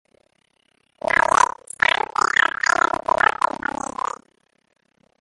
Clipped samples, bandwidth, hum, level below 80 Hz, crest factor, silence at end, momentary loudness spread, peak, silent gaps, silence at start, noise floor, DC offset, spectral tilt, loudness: under 0.1%; 11.5 kHz; none; -54 dBFS; 20 dB; 2.75 s; 11 LU; -2 dBFS; none; 1.05 s; -65 dBFS; under 0.1%; -1.5 dB/octave; -20 LUFS